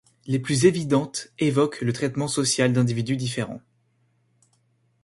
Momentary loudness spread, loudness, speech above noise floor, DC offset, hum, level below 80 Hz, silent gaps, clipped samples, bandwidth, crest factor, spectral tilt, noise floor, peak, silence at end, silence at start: 10 LU; -23 LUFS; 44 dB; under 0.1%; none; -60 dBFS; none; under 0.1%; 11.5 kHz; 20 dB; -5 dB/octave; -67 dBFS; -6 dBFS; 1.45 s; 0.25 s